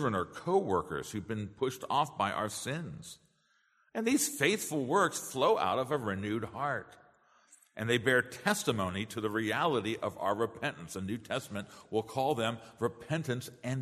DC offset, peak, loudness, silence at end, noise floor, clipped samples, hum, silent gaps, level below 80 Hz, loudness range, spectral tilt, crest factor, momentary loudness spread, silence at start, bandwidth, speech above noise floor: under 0.1%; -12 dBFS; -33 LUFS; 0 s; -72 dBFS; under 0.1%; none; none; -68 dBFS; 4 LU; -4.5 dB/octave; 22 dB; 10 LU; 0 s; 13.5 kHz; 39 dB